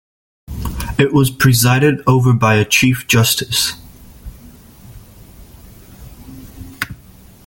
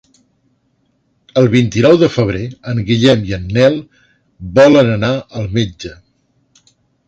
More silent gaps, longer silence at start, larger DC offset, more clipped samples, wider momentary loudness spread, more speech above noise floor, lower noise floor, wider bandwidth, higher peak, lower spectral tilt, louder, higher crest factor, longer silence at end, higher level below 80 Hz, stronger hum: neither; second, 0.5 s vs 1.35 s; neither; neither; first, 23 LU vs 14 LU; second, 29 dB vs 49 dB; second, -42 dBFS vs -61 dBFS; first, 17 kHz vs 8.2 kHz; about the same, 0 dBFS vs 0 dBFS; second, -4.5 dB/octave vs -6.5 dB/octave; about the same, -14 LUFS vs -13 LUFS; about the same, 16 dB vs 14 dB; second, 0.5 s vs 1.15 s; about the same, -36 dBFS vs -40 dBFS; neither